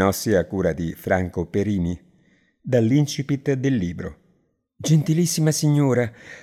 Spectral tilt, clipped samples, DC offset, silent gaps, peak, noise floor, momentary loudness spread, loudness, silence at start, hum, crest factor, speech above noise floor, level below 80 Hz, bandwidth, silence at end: -6 dB/octave; under 0.1%; under 0.1%; none; -6 dBFS; -66 dBFS; 10 LU; -22 LUFS; 0 s; none; 16 dB; 45 dB; -52 dBFS; 15.5 kHz; 0 s